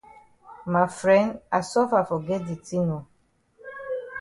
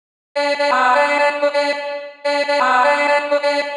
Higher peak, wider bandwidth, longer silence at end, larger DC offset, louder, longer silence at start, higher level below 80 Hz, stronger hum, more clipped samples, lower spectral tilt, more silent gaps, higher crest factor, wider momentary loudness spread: about the same, -6 dBFS vs -4 dBFS; about the same, 11.5 kHz vs 10.5 kHz; about the same, 0 s vs 0 s; neither; second, -25 LUFS vs -16 LUFS; about the same, 0.45 s vs 0.35 s; first, -62 dBFS vs under -90 dBFS; neither; neither; first, -6.5 dB/octave vs -0.5 dB/octave; neither; first, 20 dB vs 14 dB; first, 15 LU vs 9 LU